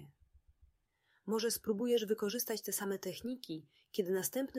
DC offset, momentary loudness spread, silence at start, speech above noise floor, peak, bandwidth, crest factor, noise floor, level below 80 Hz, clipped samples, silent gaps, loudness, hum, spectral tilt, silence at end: under 0.1%; 11 LU; 0 s; 40 dB; -22 dBFS; 16 kHz; 18 dB; -77 dBFS; -74 dBFS; under 0.1%; none; -37 LUFS; none; -3.5 dB/octave; 0 s